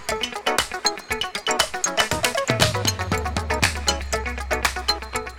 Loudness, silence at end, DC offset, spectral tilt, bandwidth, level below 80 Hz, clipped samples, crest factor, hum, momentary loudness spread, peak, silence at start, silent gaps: -22 LUFS; 0 s; under 0.1%; -2.5 dB/octave; over 20 kHz; -36 dBFS; under 0.1%; 22 dB; none; 6 LU; -2 dBFS; 0 s; none